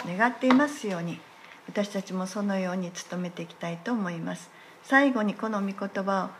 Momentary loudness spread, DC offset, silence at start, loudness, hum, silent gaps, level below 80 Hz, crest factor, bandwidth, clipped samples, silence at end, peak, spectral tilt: 15 LU; under 0.1%; 0 s; -28 LUFS; none; none; -82 dBFS; 22 dB; 13 kHz; under 0.1%; 0 s; -6 dBFS; -5.5 dB/octave